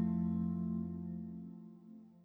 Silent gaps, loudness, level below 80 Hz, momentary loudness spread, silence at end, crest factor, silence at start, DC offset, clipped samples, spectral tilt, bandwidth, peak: none; -40 LUFS; -62 dBFS; 19 LU; 0.05 s; 14 dB; 0 s; under 0.1%; under 0.1%; -12.5 dB/octave; 2.1 kHz; -26 dBFS